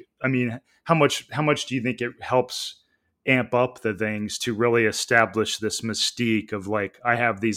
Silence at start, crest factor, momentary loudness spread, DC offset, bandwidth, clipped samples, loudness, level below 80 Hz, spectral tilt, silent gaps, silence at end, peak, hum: 0.2 s; 22 dB; 8 LU; under 0.1%; 16.5 kHz; under 0.1%; -23 LUFS; -64 dBFS; -4 dB/octave; none; 0 s; -2 dBFS; none